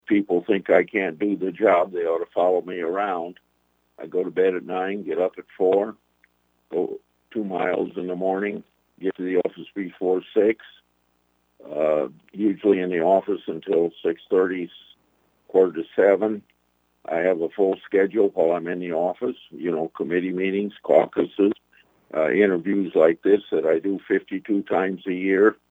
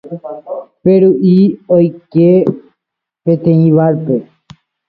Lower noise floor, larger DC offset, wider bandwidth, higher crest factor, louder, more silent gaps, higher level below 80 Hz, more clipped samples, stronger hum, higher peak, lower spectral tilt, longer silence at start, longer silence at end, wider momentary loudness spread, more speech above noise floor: second, -67 dBFS vs -79 dBFS; neither; second, 3.9 kHz vs 4.8 kHz; first, 20 dB vs 12 dB; second, -23 LUFS vs -11 LUFS; neither; second, -72 dBFS vs -54 dBFS; neither; first, 60 Hz at -60 dBFS vs none; about the same, -2 dBFS vs 0 dBFS; second, -8.5 dB/octave vs -12 dB/octave; about the same, 0.1 s vs 0.05 s; second, 0.15 s vs 0.65 s; second, 11 LU vs 16 LU; second, 45 dB vs 69 dB